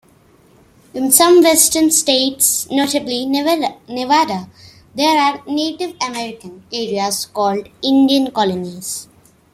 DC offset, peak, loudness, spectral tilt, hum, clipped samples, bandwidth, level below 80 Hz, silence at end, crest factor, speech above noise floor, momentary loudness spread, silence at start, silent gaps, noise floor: under 0.1%; 0 dBFS; -15 LUFS; -2 dB/octave; none; under 0.1%; 16 kHz; -58 dBFS; 0.5 s; 16 dB; 35 dB; 15 LU; 0.95 s; none; -50 dBFS